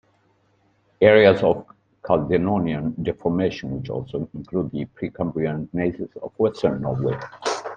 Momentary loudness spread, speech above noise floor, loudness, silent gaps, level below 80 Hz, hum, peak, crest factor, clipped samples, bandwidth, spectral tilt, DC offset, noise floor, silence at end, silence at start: 14 LU; 42 dB; -22 LUFS; none; -52 dBFS; none; 0 dBFS; 22 dB; under 0.1%; 9.4 kHz; -7 dB/octave; under 0.1%; -63 dBFS; 0 s; 1 s